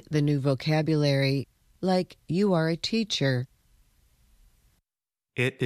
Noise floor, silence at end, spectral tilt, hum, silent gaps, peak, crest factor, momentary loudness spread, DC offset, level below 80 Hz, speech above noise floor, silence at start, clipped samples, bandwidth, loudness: under -90 dBFS; 0 s; -6 dB/octave; none; none; -12 dBFS; 16 dB; 8 LU; under 0.1%; -62 dBFS; over 65 dB; 0.1 s; under 0.1%; 13 kHz; -26 LUFS